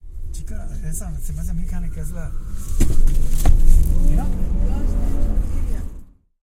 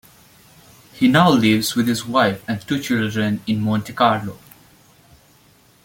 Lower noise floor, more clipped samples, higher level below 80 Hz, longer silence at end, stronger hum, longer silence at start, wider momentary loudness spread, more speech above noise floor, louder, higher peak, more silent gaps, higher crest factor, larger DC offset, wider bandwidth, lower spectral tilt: second, -38 dBFS vs -53 dBFS; neither; first, -18 dBFS vs -56 dBFS; second, 0.5 s vs 1.5 s; neither; second, 0.05 s vs 0.95 s; first, 13 LU vs 10 LU; second, 24 dB vs 35 dB; second, -25 LUFS vs -18 LUFS; about the same, 0 dBFS vs -2 dBFS; neither; about the same, 16 dB vs 18 dB; neither; second, 13 kHz vs 17 kHz; about the same, -6.5 dB/octave vs -5.5 dB/octave